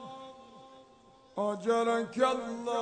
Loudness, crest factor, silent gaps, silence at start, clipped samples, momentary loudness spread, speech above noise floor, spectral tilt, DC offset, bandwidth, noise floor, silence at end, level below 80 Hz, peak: -31 LUFS; 18 dB; none; 0 s; under 0.1%; 21 LU; 29 dB; -4.5 dB/octave; under 0.1%; 9.4 kHz; -59 dBFS; 0 s; -72 dBFS; -14 dBFS